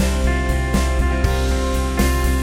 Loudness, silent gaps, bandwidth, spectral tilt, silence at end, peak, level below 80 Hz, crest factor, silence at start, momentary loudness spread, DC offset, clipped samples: -19 LUFS; none; 16.5 kHz; -5.5 dB/octave; 0 s; -4 dBFS; -20 dBFS; 14 dB; 0 s; 2 LU; under 0.1%; under 0.1%